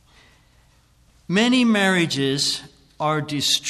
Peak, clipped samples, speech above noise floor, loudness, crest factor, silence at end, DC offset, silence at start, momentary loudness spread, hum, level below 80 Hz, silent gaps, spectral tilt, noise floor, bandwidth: -6 dBFS; under 0.1%; 37 dB; -20 LUFS; 16 dB; 0 s; under 0.1%; 1.3 s; 7 LU; none; -58 dBFS; none; -3.5 dB/octave; -57 dBFS; 14 kHz